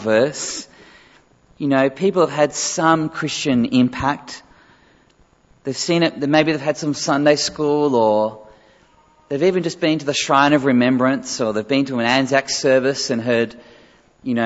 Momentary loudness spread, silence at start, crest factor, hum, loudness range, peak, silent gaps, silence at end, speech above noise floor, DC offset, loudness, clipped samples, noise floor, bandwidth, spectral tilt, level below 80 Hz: 10 LU; 0 s; 18 dB; none; 4 LU; -2 dBFS; none; 0 s; 38 dB; under 0.1%; -18 LUFS; under 0.1%; -55 dBFS; 8 kHz; -4.5 dB/octave; -56 dBFS